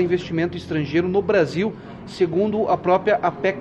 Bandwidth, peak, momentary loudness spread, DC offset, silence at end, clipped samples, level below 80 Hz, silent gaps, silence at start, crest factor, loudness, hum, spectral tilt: 8.8 kHz; -6 dBFS; 7 LU; under 0.1%; 0 s; under 0.1%; -54 dBFS; none; 0 s; 14 dB; -21 LUFS; none; -7 dB/octave